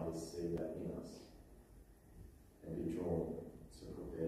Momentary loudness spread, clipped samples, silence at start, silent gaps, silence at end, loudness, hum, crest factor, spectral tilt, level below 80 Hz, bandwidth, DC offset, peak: 22 LU; under 0.1%; 0 s; none; 0 s; -45 LUFS; none; 18 dB; -7.5 dB/octave; -60 dBFS; 15.5 kHz; under 0.1%; -28 dBFS